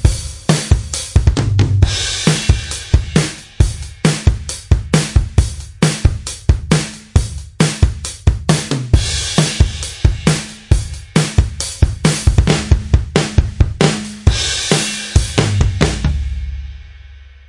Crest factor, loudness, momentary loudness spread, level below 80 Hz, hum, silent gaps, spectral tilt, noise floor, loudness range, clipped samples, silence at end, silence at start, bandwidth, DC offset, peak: 14 dB; -16 LUFS; 4 LU; -20 dBFS; none; none; -4.5 dB/octave; -37 dBFS; 2 LU; under 0.1%; 0.2 s; 0 s; 11.5 kHz; 0.3%; 0 dBFS